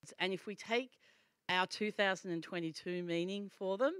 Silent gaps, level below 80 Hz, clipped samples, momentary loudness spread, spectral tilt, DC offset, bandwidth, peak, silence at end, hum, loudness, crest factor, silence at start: none; under -90 dBFS; under 0.1%; 7 LU; -4.5 dB/octave; under 0.1%; 13 kHz; -18 dBFS; 0 s; none; -38 LUFS; 20 dB; 0.05 s